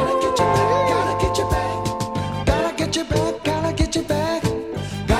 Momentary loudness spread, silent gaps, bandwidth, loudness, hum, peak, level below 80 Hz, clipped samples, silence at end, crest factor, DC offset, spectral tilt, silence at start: 7 LU; none; 16 kHz; -21 LUFS; none; -4 dBFS; -32 dBFS; under 0.1%; 0 s; 16 dB; under 0.1%; -5 dB/octave; 0 s